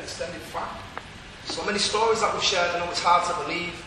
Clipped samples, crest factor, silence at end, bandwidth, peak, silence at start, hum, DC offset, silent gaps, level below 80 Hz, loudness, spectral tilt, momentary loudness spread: under 0.1%; 18 dB; 0 s; 13.5 kHz; -8 dBFS; 0 s; none; under 0.1%; none; -52 dBFS; -24 LUFS; -2 dB/octave; 16 LU